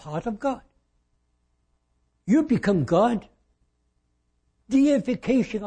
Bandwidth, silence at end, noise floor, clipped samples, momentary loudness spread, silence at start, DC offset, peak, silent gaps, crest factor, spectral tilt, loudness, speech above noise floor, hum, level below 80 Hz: 9.4 kHz; 0 s; -71 dBFS; under 0.1%; 11 LU; 0.05 s; under 0.1%; -8 dBFS; none; 18 dB; -7.5 dB/octave; -23 LUFS; 48 dB; 60 Hz at -50 dBFS; -54 dBFS